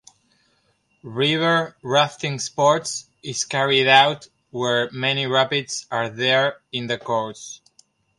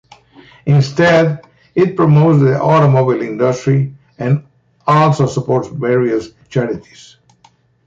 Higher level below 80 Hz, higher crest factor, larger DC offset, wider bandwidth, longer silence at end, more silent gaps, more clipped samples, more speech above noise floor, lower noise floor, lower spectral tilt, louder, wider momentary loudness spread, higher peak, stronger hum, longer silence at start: second, -66 dBFS vs -50 dBFS; first, 22 dB vs 12 dB; neither; first, 11.5 kHz vs 7.6 kHz; second, 0.65 s vs 1.05 s; neither; neither; first, 45 dB vs 39 dB; first, -65 dBFS vs -52 dBFS; second, -3 dB/octave vs -7.5 dB/octave; second, -20 LUFS vs -14 LUFS; first, 15 LU vs 12 LU; about the same, 0 dBFS vs -2 dBFS; neither; first, 1.05 s vs 0.65 s